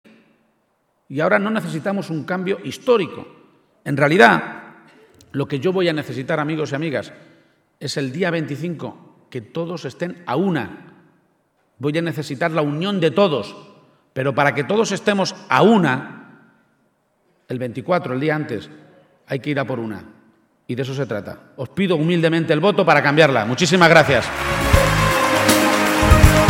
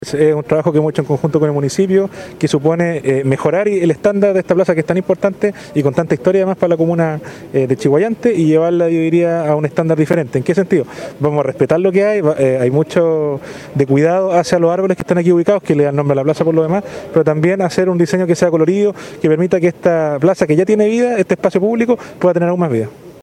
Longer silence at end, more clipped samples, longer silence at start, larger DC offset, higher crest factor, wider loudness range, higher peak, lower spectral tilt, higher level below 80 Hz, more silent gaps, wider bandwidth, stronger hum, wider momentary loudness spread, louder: about the same, 0 s vs 0.1 s; neither; first, 1.1 s vs 0 s; neither; first, 20 dB vs 14 dB; first, 11 LU vs 1 LU; about the same, 0 dBFS vs 0 dBFS; second, -5 dB/octave vs -7.5 dB/octave; first, -32 dBFS vs -54 dBFS; neither; first, 17 kHz vs 13 kHz; neither; first, 17 LU vs 5 LU; second, -18 LUFS vs -14 LUFS